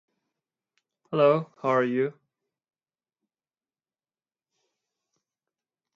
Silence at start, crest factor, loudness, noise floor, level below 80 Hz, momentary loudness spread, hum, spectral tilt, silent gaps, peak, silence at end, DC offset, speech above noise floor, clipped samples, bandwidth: 1.1 s; 22 dB; -25 LUFS; under -90 dBFS; -82 dBFS; 9 LU; none; -8 dB/octave; none; -8 dBFS; 3.85 s; under 0.1%; over 66 dB; under 0.1%; 7.2 kHz